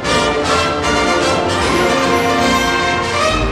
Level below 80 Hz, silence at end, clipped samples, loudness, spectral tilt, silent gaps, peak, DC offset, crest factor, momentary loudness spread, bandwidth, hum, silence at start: -30 dBFS; 0 s; under 0.1%; -14 LUFS; -3.5 dB/octave; none; -2 dBFS; under 0.1%; 14 dB; 2 LU; 15.5 kHz; none; 0 s